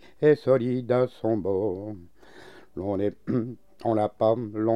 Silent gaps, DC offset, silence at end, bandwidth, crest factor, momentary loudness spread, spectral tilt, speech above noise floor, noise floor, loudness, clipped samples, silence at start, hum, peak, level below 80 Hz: none; 0.3%; 0 s; 9.8 kHz; 18 dB; 14 LU; -9 dB/octave; 25 dB; -50 dBFS; -26 LUFS; under 0.1%; 0.2 s; none; -8 dBFS; -62 dBFS